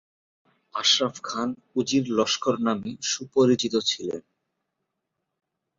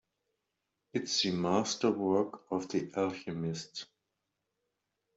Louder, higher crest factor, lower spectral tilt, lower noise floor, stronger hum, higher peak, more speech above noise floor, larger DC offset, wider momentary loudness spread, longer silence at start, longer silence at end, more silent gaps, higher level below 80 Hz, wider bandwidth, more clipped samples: first, -24 LUFS vs -33 LUFS; about the same, 20 dB vs 20 dB; about the same, -3.5 dB/octave vs -4.5 dB/octave; second, -81 dBFS vs -85 dBFS; neither; first, -8 dBFS vs -16 dBFS; first, 56 dB vs 52 dB; neither; about the same, 9 LU vs 11 LU; second, 0.75 s vs 0.95 s; first, 1.6 s vs 1.35 s; neither; first, -68 dBFS vs -74 dBFS; about the same, 7.6 kHz vs 8 kHz; neither